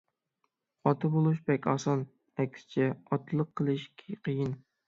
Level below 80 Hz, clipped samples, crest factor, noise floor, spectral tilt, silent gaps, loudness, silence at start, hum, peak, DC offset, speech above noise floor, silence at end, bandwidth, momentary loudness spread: -72 dBFS; under 0.1%; 20 dB; -80 dBFS; -7.5 dB/octave; none; -31 LUFS; 0.85 s; none; -12 dBFS; under 0.1%; 50 dB; 0.3 s; 7.6 kHz; 8 LU